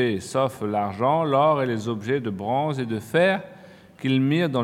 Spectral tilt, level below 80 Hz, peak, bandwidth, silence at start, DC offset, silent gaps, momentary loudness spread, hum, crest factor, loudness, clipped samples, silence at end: -6.5 dB/octave; -68 dBFS; -8 dBFS; 15.5 kHz; 0 s; under 0.1%; none; 8 LU; none; 16 dB; -23 LUFS; under 0.1%; 0 s